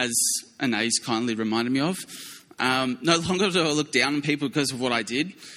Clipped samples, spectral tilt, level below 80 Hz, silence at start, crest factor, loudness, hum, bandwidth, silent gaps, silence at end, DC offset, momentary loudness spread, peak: under 0.1%; -3 dB/octave; -62 dBFS; 0 s; 20 dB; -24 LUFS; none; 16 kHz; none; 0 s; under 0.1%; 6 LU; -4 dBFS